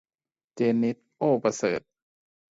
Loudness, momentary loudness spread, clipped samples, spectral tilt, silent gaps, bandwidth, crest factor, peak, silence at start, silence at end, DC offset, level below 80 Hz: -27 LUFS; 5 LU; under 0.1%; -6 dB/octave; none; 7.8 kHz; 18 dB; -10 dBFS; 0.55 s; 0.7 s; under 0.1%; -70 dBFS